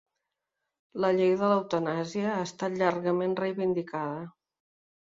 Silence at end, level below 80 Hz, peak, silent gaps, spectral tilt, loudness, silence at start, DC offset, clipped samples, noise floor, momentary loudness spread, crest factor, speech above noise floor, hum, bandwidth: 0.75 s; -72 dBFS; -12 dBFS; none; -6.5 dB/octave; -28 LUFS; 0.95 s; under 0.1%; under 0.1%; -85 dBFS; 10 LU; 18 dB; 57 dB; none; 7.8 kHz